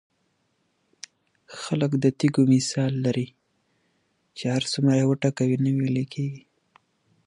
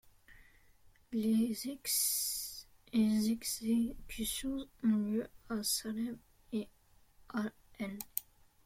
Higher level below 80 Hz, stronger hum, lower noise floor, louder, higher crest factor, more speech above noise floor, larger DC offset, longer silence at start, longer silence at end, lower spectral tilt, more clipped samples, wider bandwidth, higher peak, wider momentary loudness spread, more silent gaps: second, -66 dBFS vs -60 dBFS; neither; first, -71 dBFS vs -66 dBFS; first, -24 LUFS vs -36 LUFS; second, 18 dB vs 24 dB; first, 48 dB vs 31 dB; neither; first, 1.5 s vs 0.3 s; first, 0.9 s vs 0.45 s; first, -6 dB/octave vs -3.5 dB/octave; neither; second, 11.5 kHz vs 16.5 kHz; first, -8 dBFS vs -14 dBFS; first, 23 LU vs 12 LU; neither